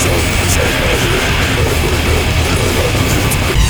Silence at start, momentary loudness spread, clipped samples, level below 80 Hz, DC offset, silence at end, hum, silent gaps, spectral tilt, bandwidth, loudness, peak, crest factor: 0 s; 1 LU; under 0.1%; -18 dBFS; under 0.1%; 0 s; none; none; -4 dB/octave; over 20 kHz; -13 LUFS; 0 dBFS; 12 dB